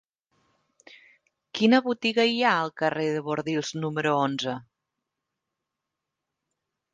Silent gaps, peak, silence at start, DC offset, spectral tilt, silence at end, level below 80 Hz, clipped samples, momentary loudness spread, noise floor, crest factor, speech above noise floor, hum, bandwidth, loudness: none; -6 dBFS; 1.55 s; under 0.1%; -5 dB/octave; 2.3 s; -74 dBFS; under 0.1%; 9 LU; -85 dBFS; 22 dB; 61 dB; none; 9.4 kHz; -25 LUFS